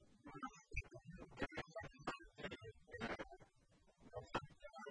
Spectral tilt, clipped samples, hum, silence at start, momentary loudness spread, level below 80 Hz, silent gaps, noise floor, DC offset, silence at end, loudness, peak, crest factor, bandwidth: -5 dB/octave; under 0.1%; none; 0 s; 10 LU; -62 dBFS; none; -73 dBFS; under 0.1%; 0 s; -52 LUFS; -28 dBFS; 24 dB; 10 kHz